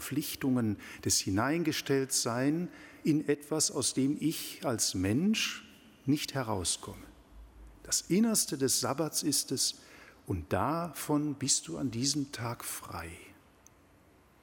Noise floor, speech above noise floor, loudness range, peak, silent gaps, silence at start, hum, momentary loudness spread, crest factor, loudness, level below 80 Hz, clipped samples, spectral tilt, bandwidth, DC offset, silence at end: -62 dBFS; 30 dB; 3 LU; -16 dBFS; none; 0 s; none; 11 LU; 18 dB; -31 LUFS; -60 dBFS; under 0.1%; -3.5 dB/octave; 17.5 kHz; under 0.1%; 1.1 s